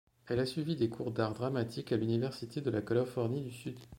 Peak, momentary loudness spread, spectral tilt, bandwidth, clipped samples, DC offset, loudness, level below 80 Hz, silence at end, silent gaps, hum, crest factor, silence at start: -16 dBFS; 5 LU; -7 dB/octave; 16.5 kHz; under 0.1%; under 0.1%; -35 LUFS; -66 dBFS; 0 s; none; none; 18 dB; 0.25 s